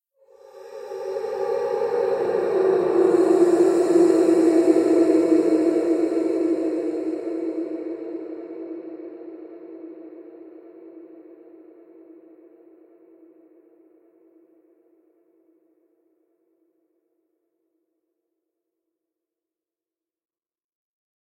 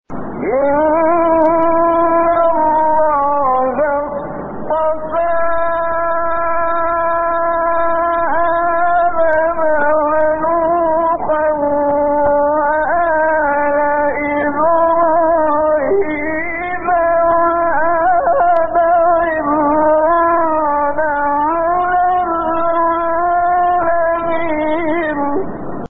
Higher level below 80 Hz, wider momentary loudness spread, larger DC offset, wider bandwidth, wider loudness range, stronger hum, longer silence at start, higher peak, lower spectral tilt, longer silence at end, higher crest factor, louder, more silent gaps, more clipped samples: second, -74 dBFS vs -40 dBFS; first, 23 LU vs 5 LU; neither; first, 11 kHz vs 3.9 kHz; first, 22 LU vs 3 LU; neither; first, 0.55 s vs 0.1 s; about the same, -4 dBFS vs -4 dBFS; about the same, -6 dB/octave vs -5 dB/octave; first, 10.05 s vs 0.05 s; first, 20 dB vs 10 dB; second, -21 LUFS vs -14 LUFS; neither; neither